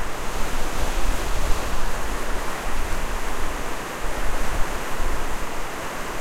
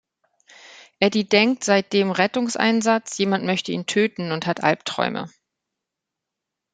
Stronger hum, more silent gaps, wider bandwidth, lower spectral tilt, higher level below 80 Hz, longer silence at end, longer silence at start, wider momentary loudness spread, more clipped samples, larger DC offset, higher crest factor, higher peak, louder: neither; neither; first, 15.5 kHz vs 9.4 kHz; about the same, -3.5 dB/octave vs -4 dB/octave; first, -26 dBFS vs -68 dBFS; second, 0 s vs 1.45 s; second, 0 s vs 0.7 s; second, 3 LU vs 7 LU; neither; neither; second, 14 dB vs 22 dB; second, -6 dBFS vs -2 dBFS; second, -29 LUFS vs -21 LUFS